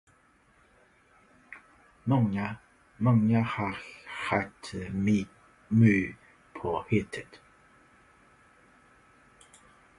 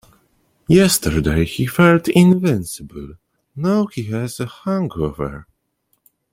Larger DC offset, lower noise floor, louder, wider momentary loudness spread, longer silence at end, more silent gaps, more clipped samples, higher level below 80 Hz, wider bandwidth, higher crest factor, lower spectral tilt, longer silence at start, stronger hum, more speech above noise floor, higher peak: neither; about the same, -64 dBFS vs -67 dBFS; second, -29 LUFS vs -17 LUFS; first, 24 LU vs 19 LU; first, 2.6 s vs 0.9 s; neither; neither; second, -58 dBFS vs -38 dBFS; second, 11 kHz vs 16.5 kHz; about the same, 22 dB vs 18 dB; first, -8 dB/octave vs -5.5 dB/octave; first, 1.5 s vs 0.7 s; neither; second, 37 dB vs 51 dB; second, -10 dBFS vs 0 dBFS